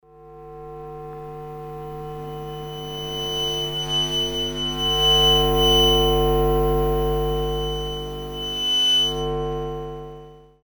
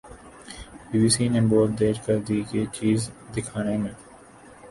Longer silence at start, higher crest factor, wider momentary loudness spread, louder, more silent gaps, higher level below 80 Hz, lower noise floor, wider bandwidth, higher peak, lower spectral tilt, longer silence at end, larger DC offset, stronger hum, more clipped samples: about the same, 0.15 s vs 0.05 s; about the same, 16 dB vs 16 dB; about the same, 20 LU vs 21 LU; first, -20 LUFS vs -24 LUFS; neither; first, -32 dBFS vs -50 dBFS; second, -43 dBFS vs -48 dBFS; first, over 20 kHz vs 11.5 kHz; about the same, -6 dBFS vs -8 dBFS; second, -4 dB/octave vs -5.5 dB/octave; first, 0.25 s vs 0 s; neither; first, 50 Hz at -35 dBFS vs none; neither